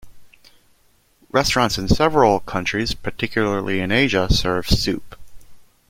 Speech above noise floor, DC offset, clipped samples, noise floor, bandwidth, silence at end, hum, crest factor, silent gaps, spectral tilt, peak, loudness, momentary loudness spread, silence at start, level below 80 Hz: 40 dB; under 0.1%; under 0.1%; -59 dBFS; 16.5 kHz; 0.3 s; none; 20 dB; none; -4.5 dB/octave; 0 dBFS; -19 LUFS; 7 LU; 0.05 s; -32 dBFS